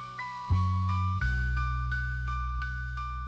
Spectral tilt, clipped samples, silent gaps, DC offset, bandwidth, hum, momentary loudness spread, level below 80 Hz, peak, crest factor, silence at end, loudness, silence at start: -6.5 dB/octave; under 0.1%; none; under 0.1%; 7.6 kHz; none; 7 LU; -34 dBFS; -18 dBFS; 12 dB; 0 s; -31 LUFS; 0 s